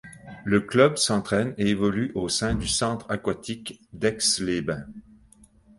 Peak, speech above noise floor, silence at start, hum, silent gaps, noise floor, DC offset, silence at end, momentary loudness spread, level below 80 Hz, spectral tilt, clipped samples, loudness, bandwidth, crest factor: -4 dBFS; 31 dB; 0.05 s; none; none; -56 dBFS; under 0.1%; 0.8 s; 15 LU; -46 dBFS; -4 dB/octave; under 0.1%; -24 LUFS; 11.5 kHz; 22 dB